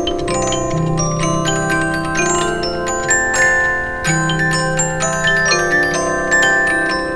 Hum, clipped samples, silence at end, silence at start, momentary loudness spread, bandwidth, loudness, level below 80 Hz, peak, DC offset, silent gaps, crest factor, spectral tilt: none; under 0.1%; 0 s; 0 s; 6 LU; 11 kHz; -15 LUFS; -32 dBFS; 0 dBFS; under 0.1%; none; 16 dB; -3.5 dB/octave